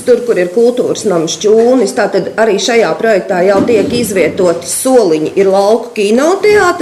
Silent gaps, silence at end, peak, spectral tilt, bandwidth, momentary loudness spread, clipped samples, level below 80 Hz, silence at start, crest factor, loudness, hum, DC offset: none; 0 s; 0 dBFS; -4 dB/octave; 15 kHz; 4 LU; under 0.1%; -48 dBFS; 0 s; 10 dB; -10 LUFS; none; under 0.1%